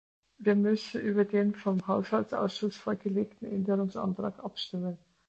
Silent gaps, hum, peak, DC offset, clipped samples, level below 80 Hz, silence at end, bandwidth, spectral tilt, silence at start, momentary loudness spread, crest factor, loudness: none; none; -14 dBFS; under 0.1%; under 0.1%; -70 dBFS; 0.3 s; 7.8 kHz; -7.5 dB/octave; 0.4 s; 9 LU; 16 dB; -31 LUFS